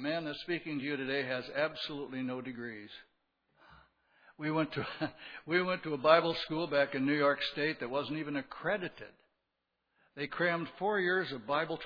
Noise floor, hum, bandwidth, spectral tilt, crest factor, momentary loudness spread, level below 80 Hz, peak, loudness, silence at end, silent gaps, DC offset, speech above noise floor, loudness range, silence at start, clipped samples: -84 dBFS; none; 5.4 kHz; -7 dB/octave; 26 dB; 13 LU; -72 dBFS; -10 dBFS; -34 LUFS; 0 s; none; under 0.1%; 50 dB; 9 LU; 0 s; under 0.1%